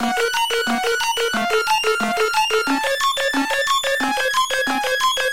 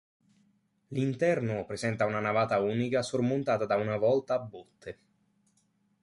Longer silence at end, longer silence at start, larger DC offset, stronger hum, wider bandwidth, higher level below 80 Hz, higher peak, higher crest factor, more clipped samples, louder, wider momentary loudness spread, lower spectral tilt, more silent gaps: second, 0 s vs 1.1 s; second, 0 s vs 0.9 s; first, 0.9% vs under 0.1%; neither; first, 17 kHz vs 11.5 kHz; first, -54 dBFS vs -66 dBFS; first, -8 dBFS vs -14 dBFS; about the same, 12 dB vs 16 dB; neither; first, -19 LUFS vs -29 LUFS; second, 2 LU vs 17 LU; second, -1 dB/octave vs -6.5 dB/octave; neither